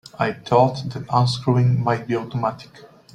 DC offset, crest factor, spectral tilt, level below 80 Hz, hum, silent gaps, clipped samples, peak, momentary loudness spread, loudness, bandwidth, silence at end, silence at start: under 0.1%; 18 dB; -7 dB/octave; -56 dBFS; none; none; under 0.1%; -2 dBFS; 8 LU; -21 LUFS; 10 kHz; 0.3 s; 0.2 s